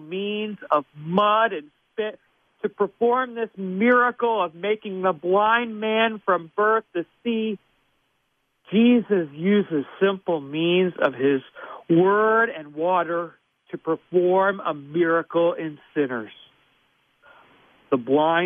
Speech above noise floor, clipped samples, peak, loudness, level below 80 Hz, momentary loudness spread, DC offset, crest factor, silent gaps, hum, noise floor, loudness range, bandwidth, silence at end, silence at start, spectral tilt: 49 dB; under 0.1%; -4 dBFS; -22 LUFS; -72 dBFS; 12 LU; under 0.1%; 18 dB; none; none; -71 dBFS; 3 LU; 3.7 kHz; 0 s; 0 s; -9 dB/octave